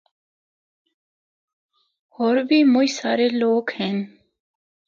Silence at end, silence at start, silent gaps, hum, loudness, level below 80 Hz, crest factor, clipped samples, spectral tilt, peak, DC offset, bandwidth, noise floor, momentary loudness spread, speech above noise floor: 0.8 s; 2.2 s; none; none; -20 LUFS; -76 dBFS; 16 dB; under 0.1%; -5 dB/octave; -6 dBFS; under 0.1%; 7.6 kHz; under -90 dBFS; 9 LU; over 71 dB